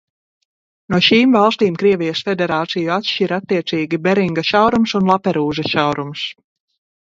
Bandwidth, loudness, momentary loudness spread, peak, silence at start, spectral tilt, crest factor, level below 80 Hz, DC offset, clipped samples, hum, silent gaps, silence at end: 7.8 kHz; -16 LUFS; 7 LU; 0 dBFS; 0.9 s; -6 dB/octave; 16 dB; -54 dBFS; under 0.1%; under 0.1%; none; none; 0.7 s